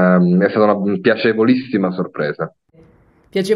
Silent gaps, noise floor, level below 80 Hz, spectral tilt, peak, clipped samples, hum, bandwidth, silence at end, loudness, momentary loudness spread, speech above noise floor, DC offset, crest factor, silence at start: none; -51 dBFS; -62 dBFS; -7.5 dB/octave; 0 dBFS; under 0.1%; none; 11.5 kHz; 0 s; -16 LUFS; 10 LU; 36 dB; under 0.1%; 16 dB; 0 s